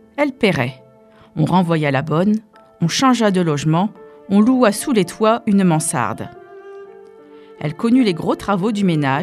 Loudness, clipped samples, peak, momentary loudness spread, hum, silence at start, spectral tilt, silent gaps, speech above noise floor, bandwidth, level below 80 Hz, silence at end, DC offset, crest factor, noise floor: -17 LUFS; under 0.1%; 0 dBFS; 13 LU; none; 0.15 s; -5.5 dB/octave; none; 31 dB; 14.5 kHz; -54 dBFS; 0 s; under 0.1%; 16 dB; -47 dBFS